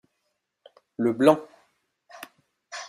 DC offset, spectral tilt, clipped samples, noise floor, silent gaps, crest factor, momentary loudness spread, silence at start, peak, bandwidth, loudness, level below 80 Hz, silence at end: under 0.1%; -6 dB/octave; under 0.1%; -78 dBFS; none; 24 dB; 25 LU; 1 s; -4 dBFS; 15.5 kHz; -23 LUFS; -70 dBFS; 0 s